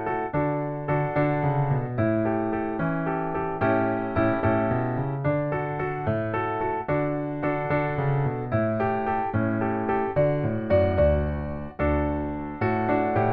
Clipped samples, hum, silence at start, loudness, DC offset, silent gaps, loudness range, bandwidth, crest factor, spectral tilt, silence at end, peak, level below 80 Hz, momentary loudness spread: under 0.1%; none; 0 s; -25 LUFS; under 0.1%; none; 2 LU; 4.9 kHz; 16 dB; -11 dB/octave; 0 s; -10 dBFS; -40 dBFS; 5 LU